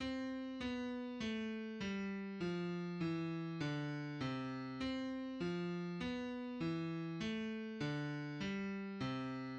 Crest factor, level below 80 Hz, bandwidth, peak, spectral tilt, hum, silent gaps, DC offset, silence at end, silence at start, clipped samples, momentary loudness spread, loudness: 14 dB; -68 dBFS; 8.6 kHz; -28 dBFS; -6.5 dB/octave; none; none; under 0.1%; 0 s; 0 s; under 0.1%; 3 LU; -43 LUFS